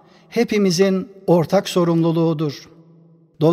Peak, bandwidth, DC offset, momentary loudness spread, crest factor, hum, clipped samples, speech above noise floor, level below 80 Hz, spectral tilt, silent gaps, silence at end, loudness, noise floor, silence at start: -4 dBFS; 15.5 kHz; under 0.1%; 9 LU; 14 dB; none; under 0.1%; 33 dB; -62 dBFS; -6.5 dB/octave; none; 0 s; -18 LUFS; -50 dBFS; 0.3 s